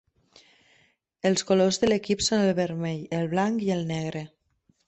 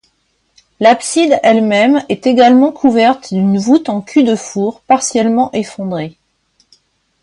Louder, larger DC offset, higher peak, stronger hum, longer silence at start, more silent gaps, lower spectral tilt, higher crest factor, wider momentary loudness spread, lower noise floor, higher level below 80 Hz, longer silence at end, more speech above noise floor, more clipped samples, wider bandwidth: second, -25 LUFS vs -12 LUFS; neither; second, -10 dBFS vs 0 dBFS; neither; first, 1.25 s vs 0.8 s; neither; about the same, -5 dB/octave vs -5 dB/octave; first, 18 dB vs 12 dB; about the same, 9 LU vs 10 LU; first, -68 dBFS vs -61 dBFS; about the same, -58 dBFS vs -56 dBFS; second, 0.6 s vs 1.15 s; second, 43 dB vs 50 dB; neither; second, 8.4 kHz vs 11.5 kHz